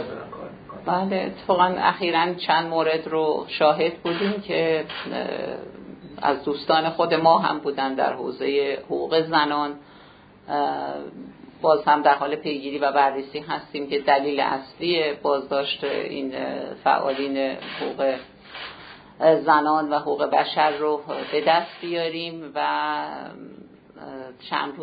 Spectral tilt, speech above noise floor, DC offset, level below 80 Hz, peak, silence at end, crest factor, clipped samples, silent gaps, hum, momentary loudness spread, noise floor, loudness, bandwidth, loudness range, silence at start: -8 dB/octave; 26 dB; under 0.1%; -64 dBFS; -2 dBFS; 0 s; 20 dB; under 0.1%; none; none; 17 LU; -49 dBFS; -23 LUFS; 5 kHz; 4 LU; 0 s